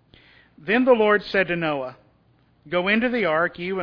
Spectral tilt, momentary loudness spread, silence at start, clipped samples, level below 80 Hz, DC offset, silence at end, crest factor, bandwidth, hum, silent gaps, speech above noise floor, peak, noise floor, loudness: -7.5 dB/octave; 11 LU; 0.65 s; under 0.1%; -58 dBFS; under 0.1%; 0 s; 18 dB; 5.4 kHz; none; none; 39 dB; -4 dBFS; -60 dBFS; -21 LUFS